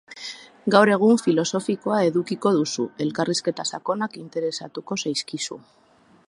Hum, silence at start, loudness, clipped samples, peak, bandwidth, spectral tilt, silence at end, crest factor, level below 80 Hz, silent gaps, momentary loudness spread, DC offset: none; 0.1 s; -23 LUFS; under 0.1%; 0 dBFS; 11.5 kHz; -4.5 dB/octave; 0.7 s; 22 dB; -72 dBFS; none; 14 LU; under 0.1%